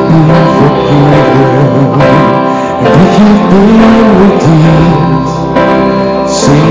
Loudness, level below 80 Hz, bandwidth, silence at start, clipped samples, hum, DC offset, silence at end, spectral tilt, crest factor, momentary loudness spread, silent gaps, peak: -6 LUFS; -28 dBFS; 8 kHz; 0 s; 10%; none; under 0.1%; 0 s; -7 dB/octave; 4 dB; 5 LU; none; 0 dBFS